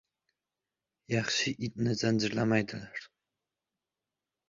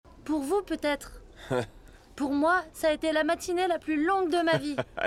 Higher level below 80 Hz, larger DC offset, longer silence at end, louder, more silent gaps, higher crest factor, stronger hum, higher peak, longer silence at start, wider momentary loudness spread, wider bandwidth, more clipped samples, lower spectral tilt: second, -66 dBFS vs -54 dBFS; neither; first, 1.45 s vs 0 s; second, -31 LUFS vs -28 LUFS; neither; about the same, 20 dB vs 16 dB; neither; about the same, -14 dBFS vs -12 dBFS; first, 1.1 s vs 0.15 s; first, 12 LU vs 9 LU; second, 7.6 kHz vs 15 kHz; neither; about the same, -4.5 dB/octave vs -4.5 dB/octave